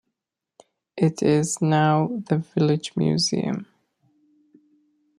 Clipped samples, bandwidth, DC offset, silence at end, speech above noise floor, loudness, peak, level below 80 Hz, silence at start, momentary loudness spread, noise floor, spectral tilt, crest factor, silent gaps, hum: under 0.1%; 11.5 kHz; under 0.1%; 1.55 s; 63 dB; -22 LUFS; -8 dBFS; -64 dBFS; 0.95 s; 7 LU; -84 dBFS; -5.5 dB/octave; 18 dB; none; none